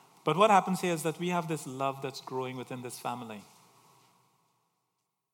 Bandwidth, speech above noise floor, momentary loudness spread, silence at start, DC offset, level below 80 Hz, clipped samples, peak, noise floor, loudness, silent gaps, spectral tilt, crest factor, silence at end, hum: 18 kHz; 52 dB; 17 LU; 0.25 s; under 0.1%; -86 dBFS; under 0.1%; -10 dBFS; -83 dBFS; -31 LUFS; none; -5 dB/octave; 22 dB; 1.9 s; none